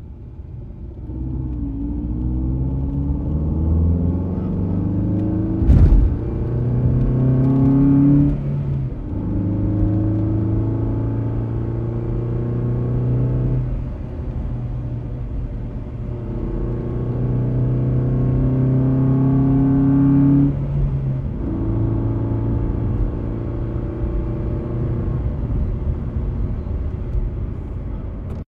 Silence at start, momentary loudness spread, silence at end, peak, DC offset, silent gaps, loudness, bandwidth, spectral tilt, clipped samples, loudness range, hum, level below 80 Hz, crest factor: 0 s; 13 LU; 0.05 s; 0 dBFS; under 0.1%; none; -20 LUFS; 3.4 kHz; -12 dB/octave; under 0.1%; 8 LU; none; -26 dBFS; 18 dB